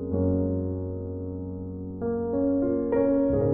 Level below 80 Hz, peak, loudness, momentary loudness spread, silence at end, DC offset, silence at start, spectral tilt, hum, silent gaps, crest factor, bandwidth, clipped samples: -46 dBFS; -12 dBFS; -27 LUFS; 12 LU; 0 s; under 0.1%; 0 s; -13 dB/octave; none; none; 14 dB; 2.5 kHz; under 0.1%